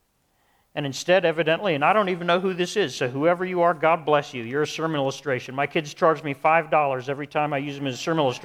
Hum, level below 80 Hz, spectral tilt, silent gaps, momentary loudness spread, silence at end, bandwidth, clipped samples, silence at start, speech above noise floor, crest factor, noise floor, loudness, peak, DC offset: none; -68 dBFS; -5 dB/octave; none; 8 LU; 0 s; 15 kHz; under 0.1%; 0.75 s; 44 dB; 18 dB; -67 dBFS; -23 LUFS; -6 dBFS; under 0.1%